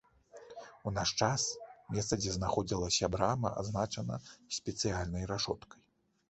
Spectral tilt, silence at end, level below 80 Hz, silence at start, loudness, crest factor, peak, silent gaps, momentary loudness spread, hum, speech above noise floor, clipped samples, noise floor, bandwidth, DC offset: -4 dB/octave; 0.55 s; -52 dBFS; 0.35 s; -35 LUFS; 22 dB; -14 dBFS; none; 12 LU; none; 21 dB; under 0.1%; -56 dBFS; 8.4 kHz; under 0.1%